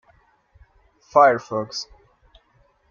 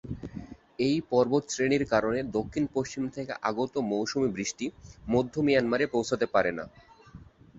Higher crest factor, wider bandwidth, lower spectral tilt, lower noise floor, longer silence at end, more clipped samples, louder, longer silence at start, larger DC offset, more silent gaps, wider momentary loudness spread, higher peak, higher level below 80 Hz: about the same, 22 dB vs 20 dB; second, 7.2 kHz vs 8 kHz; about the same, -4 dB/octave vs -5 dB/octave; first, -61 dBFS vs -51 dBFS; first, 1.05 s vs 0 s; neither; first, -20 LUFS vs -28 LUFS; first, 1.15 s vs 0.05 s; neither; neither; about the same, 16 LU vs 14 LU; first, -2 dBFS vs -8 dBFS; about the same, -60 dBFS vs -56 dBFS